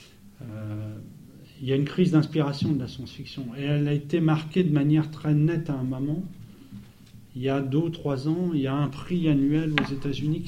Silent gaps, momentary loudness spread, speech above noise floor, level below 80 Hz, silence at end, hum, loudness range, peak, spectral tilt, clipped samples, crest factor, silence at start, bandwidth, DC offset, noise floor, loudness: none; 18 LU; 24 dB; -52 dBFS; 0 s; none; 3 LU; -2 dBFS; -8 dB/octave; under 0.1%; 24 dB; 0 s; 8.8 kHz; under 0.1%; -49 dBFS; -26 LUFS